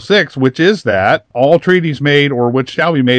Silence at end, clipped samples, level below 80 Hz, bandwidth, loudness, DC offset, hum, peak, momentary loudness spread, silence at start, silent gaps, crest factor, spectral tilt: 0 s; 0.2%; -54 dBFS; 9.2 kHz; -12 LUFS; under 0.1%; none; 0 dBFS; 3 LU; 0 s; none; 12 dB; -6.5 dB/octave